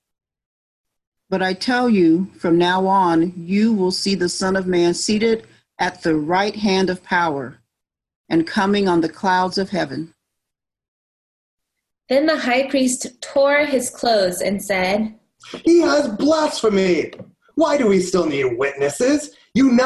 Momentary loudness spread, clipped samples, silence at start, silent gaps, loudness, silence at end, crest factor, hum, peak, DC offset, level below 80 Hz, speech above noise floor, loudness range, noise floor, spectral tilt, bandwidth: 7 LU; under 0.1%; 1.3 s; 8.16-8.24 s, 10.88-11.58 s; -18 LUFS; 0 s; 14 dB; none; -4 dBFS; under 0.1%; -54 dBFS; 65 dB; 5 LU; -83 dBFS; -4.5 dB/octave; 12.5 kHz